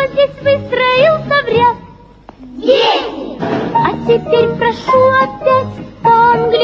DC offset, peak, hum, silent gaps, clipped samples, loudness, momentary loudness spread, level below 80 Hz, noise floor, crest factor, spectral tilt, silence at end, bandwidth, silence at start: under 0.1%; 0 dBFS; none; none; under 0.1%; -12 LUFS; 9 LU; -42 dBFS; -38 dBFS; 12 dB; -6 dB/octave; 0 s; 7.4 kHz; 0 s